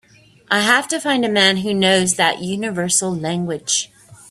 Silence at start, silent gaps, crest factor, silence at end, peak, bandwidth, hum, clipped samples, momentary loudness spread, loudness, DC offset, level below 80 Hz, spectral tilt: 0.5 s; none; 18 dB; 0.15 s; 0 dBFS; 14 kHz; none; under 0.1%; 8 LU; -17 LUFS; under 0.1%; -58 dBFS; -2.5 dB/octave